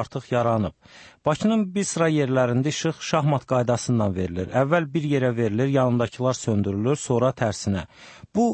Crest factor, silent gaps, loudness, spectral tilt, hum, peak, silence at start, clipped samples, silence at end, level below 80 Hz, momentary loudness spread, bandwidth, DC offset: 14 dB; none; -23 LUFS; -6 dB/octave; none; -8 dBFS; 0 s; under 0.1%; 0 s; -54 dBFS; 5 LU; 8.8 kHz; under 0.1%